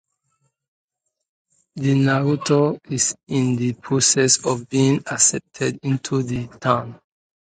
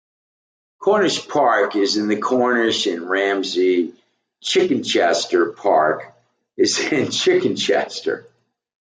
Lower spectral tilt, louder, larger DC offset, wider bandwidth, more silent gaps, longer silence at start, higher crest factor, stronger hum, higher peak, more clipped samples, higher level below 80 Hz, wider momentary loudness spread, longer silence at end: about the same, -4 dB/octave vs -3 dB/octave; about the same, -20 LUFS vs -18 LUFS; neither; about the same, 9.6 kHz vs 9.4 kHz; neither; first, 1.75 s vs 0.8 s; first, 20 dB vs 14 dB; neither; about the same, -2 dBFS vs -4 dBFS; neither; first, -58 dBFS vs -70 dBFS; about the same, 9 LU vs 7 LU; about the same, 0.55 s vs 0.6 s